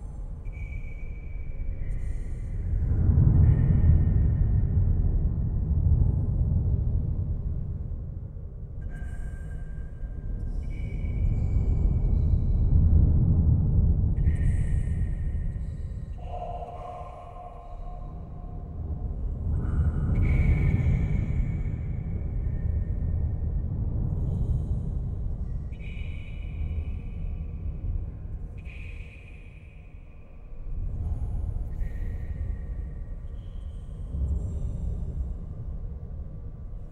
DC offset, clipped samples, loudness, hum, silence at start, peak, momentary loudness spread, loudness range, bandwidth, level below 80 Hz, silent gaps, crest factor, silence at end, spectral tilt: under 0.1%; under 0.1%; -29 LUFS; none; 0 s; -8 dBFS; 17 LU; 13 LU; 3.2 kHz; -28 dBFS; none; 18 dB; 0 s; -10 dB/octave